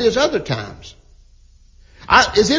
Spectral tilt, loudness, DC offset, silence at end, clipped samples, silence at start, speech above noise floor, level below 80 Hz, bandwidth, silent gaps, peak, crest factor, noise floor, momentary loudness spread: -3.5 dB/octave; -16 LUFS; under 0.1%; 0 s; under 0.1%; 0 s; 32 dB; -40 dBFS; 7.6 kHz; none; 0 dBFS; 18 dB; -48 dBFS; 20 LU